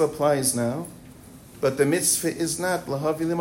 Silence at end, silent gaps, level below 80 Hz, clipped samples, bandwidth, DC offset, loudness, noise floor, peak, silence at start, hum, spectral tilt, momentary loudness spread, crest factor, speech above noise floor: 0 s; none; -56 dBFS; under 0.1%; 16.5 kHz; under 0.1%; -24 LUFS; -45 dBFS; -8 dBFS; 0 s; none; -4 dB/octave; 7 LU; 18 dB; 22 dB